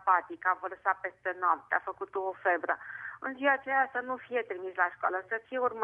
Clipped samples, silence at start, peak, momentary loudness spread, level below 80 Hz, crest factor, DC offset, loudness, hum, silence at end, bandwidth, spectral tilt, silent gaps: under 0.1%; 0 s; -12 dBFS; 8 LU; -78 dBFS; 20 dB; under 0.1%; -32 LUFS; none; 0 s; 3.7 kHz; -6 dB/octave; none